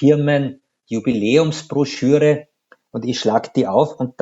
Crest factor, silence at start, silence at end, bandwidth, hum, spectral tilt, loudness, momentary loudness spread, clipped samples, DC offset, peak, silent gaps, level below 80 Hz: 16 dB; 0 s; 0.1 s; 8 kHz; none; -6.5 dB/octave; -18 LUFS; 11 LU; under 0.1%; under 0.1%; 0 dBFS; none; -60 dBFS